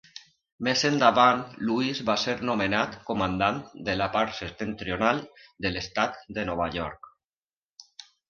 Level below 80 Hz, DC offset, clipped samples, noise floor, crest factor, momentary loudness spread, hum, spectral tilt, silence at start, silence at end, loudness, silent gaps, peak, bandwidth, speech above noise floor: -52 dBFS; under 0.1%; under 0.1%; under -90 dBFS; 22 dB; 13 LU; none; -4.5 dB/octave; 0.15 s; 0.25 s; -26 LUFS; 0.52-0.58 s, 7.24-7.46 s, 7.57-7.76 s; -6 dBFS; 7.4 kHz; over 64 dB